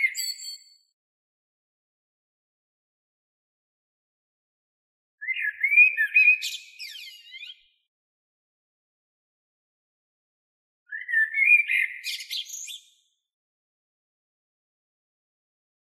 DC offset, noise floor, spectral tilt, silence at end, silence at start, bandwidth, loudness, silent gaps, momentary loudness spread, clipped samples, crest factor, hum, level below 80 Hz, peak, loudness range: under 0.1%; -65 dBFS; 9.5 dB/octave; 3.1 s; 0 s; 16 kHz; -20 LUFS; 0.93-5.18 s, 7.88-10.86 s; 24 LU; under 0.1%; 22 dB; none; under -90 dBFS; -8 dBFS; 18 LU